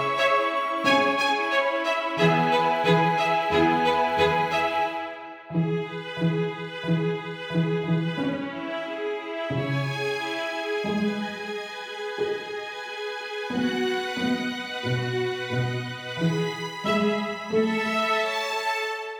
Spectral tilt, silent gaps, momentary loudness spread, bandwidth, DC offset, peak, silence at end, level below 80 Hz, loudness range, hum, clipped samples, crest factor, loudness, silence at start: -5.5 dB/octave; none; 10 LU; 18.5 kHz; under 0.1%; -8 dBFS; 0 s; -60 dBFS; 7 LU; none; under 0.1%; 18 dB; -25 LUFS; 0 s